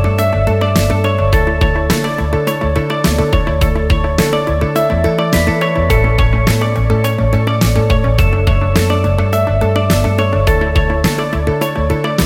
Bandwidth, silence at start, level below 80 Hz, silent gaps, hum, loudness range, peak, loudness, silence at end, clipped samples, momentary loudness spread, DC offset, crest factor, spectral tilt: 17 kHz; 0 s; -18 dBFS; none; none; 1 LU; 0 dBFS; -14 LUFS; 0 s; under 0.1%; 3 LU; under 0.1%; 12 dB; -6 dB/octave